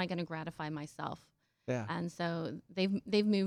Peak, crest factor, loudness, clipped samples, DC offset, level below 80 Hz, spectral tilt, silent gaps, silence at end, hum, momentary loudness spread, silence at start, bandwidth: -20 dBFS; 16 dB; -37 LUFS; under 0.1%; under 0.1%; -72 dBFS; -6.5 dB/octave; none; 0 s; none; 11 LU; 0 s; 11.5 kHz